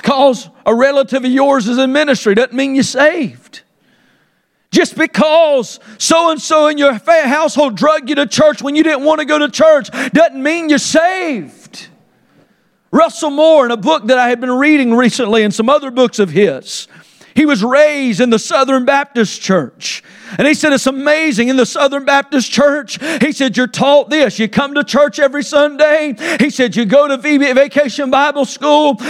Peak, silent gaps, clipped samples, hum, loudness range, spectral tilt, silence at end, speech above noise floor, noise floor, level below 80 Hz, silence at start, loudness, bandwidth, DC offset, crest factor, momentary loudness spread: 0 dBFS; none; under 0.1%; none; 3 LU; -4 dB/octave; 0 s; 48 dB; -60 dBFS; -56 dBFS; 0.05 s; -12 LUFS; 14 kHz; under 0.1%; 12 dB; 6 LU